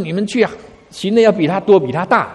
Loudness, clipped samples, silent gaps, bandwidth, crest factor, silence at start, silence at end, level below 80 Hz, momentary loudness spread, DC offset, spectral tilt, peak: -15 LUFS; under 0.1%; none; 11.5 kHz; 14 dB; 0 s; 0 s; -54 dBFS; 7 LU; under 0.1%; -6 dB/octave; 0 dBFS